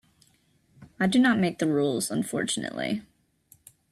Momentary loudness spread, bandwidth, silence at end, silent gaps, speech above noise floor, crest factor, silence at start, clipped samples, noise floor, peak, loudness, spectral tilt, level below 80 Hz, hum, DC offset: 10 LU; 14 kHz; 0.9 s; none; 40 dB; 18 dB; 0.8 s; under 0.1%; -65 dBFS; -10 dBFS; -26 LUFS; -4.5 dB/octave; -66 dBFS; none; under 0.1%